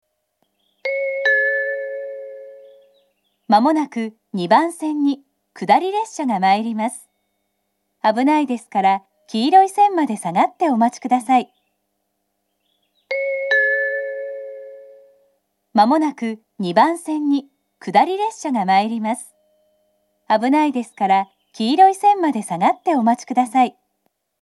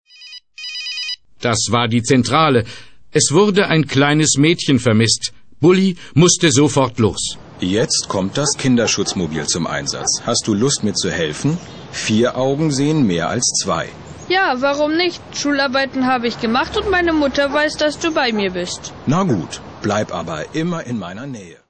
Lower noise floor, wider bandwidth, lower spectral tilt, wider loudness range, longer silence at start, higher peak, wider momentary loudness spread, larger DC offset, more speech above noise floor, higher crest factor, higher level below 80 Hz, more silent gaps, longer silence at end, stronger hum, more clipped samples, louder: first, -72 dBFS vs -40 dBFS; first, 12.5 kHz vs 9.2 kHz; about the same, -5 dB/octave vs -4 dB/octave; about the same, 5 LU vs 4 LU; first, 0.85 s vs 0.2 s; about the same, 0 dBFS vs -2 dBFS; about the same, 13 LU vs 11 LU; second, under 0.1% vs 0.3%; first, 55 dB vs 23 dB; about the same, 20 dB vs 16 dB; second, -80 dBFS vs -46 dBFS; neither; first, 0.7 s vs 0.15 s; neither; neither; about the same, -18 LUFS vs -17 LUFS